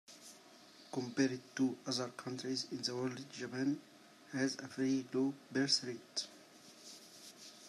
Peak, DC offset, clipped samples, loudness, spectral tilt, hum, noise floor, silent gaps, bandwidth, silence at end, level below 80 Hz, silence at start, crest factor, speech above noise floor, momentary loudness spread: -20 dBFS; under 0.1%; under 0.1%; -38 LUFS; -4 dB/octave; none; -60 dBFS; none; 13 kHz; 0 s; -86 dBFS; 0.1 s; 20 dB; 22 dB; 20 LU